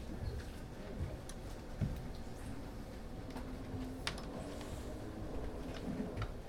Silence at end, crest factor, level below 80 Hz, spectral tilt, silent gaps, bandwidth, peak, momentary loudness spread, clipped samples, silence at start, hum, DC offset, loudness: 0 s; 26 dB; -48 dBFS; -6 dB/octave; none; 17 kHz; -18 dBFS; 7 LU; under 0.1%; 0 s; none; under 0.1%; -45 LUFS